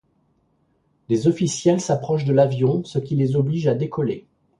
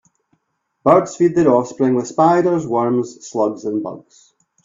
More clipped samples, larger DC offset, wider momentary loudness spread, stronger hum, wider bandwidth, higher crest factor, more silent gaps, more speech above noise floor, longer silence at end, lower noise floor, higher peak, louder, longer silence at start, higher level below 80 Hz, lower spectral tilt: neither; neither; second, 7 LU vs 11 LU; neither; first, 11 kHz vs 7.6 kHz; about the same, 16 dB vs 18 dB; neither; second, 45 dB vs 54 dB; second, 0.4 s vs 0.65 s; second, -65 dBFS vs -70 dBFS; second, -4 dBFS vs 0 dBFS; second, -21 LUFS vs -17 LUFS; first, 1.1 s vs 0.85 s; about the same, -58 dBFS vs -58 dBFS; about the same, -7 dB/octave vs -7 dB/octave